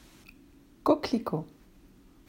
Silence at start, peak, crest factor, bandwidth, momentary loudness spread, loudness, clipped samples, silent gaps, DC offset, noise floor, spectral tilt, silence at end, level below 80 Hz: 0.85 s; -10 dBFS; 24 dB; 16 kHz; 11 LU; -30 LUFS; under 0.1%; none; under 0.1%; -57 dBFS; -6.5 dB/octave; 0.8 s; -60 dBFS